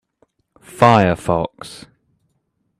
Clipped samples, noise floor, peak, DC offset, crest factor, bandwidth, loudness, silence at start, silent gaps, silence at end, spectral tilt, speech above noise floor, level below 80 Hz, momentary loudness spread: under 0.1%; -69 dBFS; 0 dBFS; under 0.1%; 20 dB; 14.5 kHz; -16 LUFS; 0.75 s; none; 1.05 s; -6.5 dB/octave; 53 dB; -50 dBFS; 23 LU